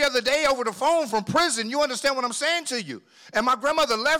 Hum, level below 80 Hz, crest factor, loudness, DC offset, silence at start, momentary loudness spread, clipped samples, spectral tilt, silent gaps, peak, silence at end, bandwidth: none; -58 dBFS; 12 dB; -23 LUFS; under 0.1%; 0 s; 7 LU; under 0.1%; -2 dB/octave; none; -12 dBFS; 0 s; 18 kHz